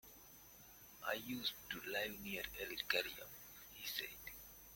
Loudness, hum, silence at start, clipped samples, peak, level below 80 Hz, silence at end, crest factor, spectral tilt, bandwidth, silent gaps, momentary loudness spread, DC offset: -44 LUFS; none; 0.05 s; under 0.1%; -20 dBFS; -70 dBFS; 0 s; 28 dB; -2 dB/octave; 17 kHz; none; 19 LU; under 0.1%